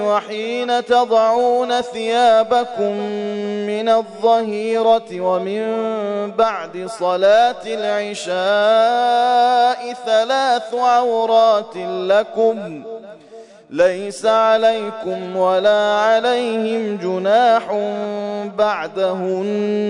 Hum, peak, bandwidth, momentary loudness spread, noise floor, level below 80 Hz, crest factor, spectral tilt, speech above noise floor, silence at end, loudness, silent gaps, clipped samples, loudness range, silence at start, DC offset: none; -4 dBFS; 11 kHz; 10 LU; -41 dBFS; -66 dBFS; 12 dB; -4.5 dB/octave; 24 dB; 0 s; -17 LUFS; none; under 0.1%; 3 LU; 0 s; under 0.1%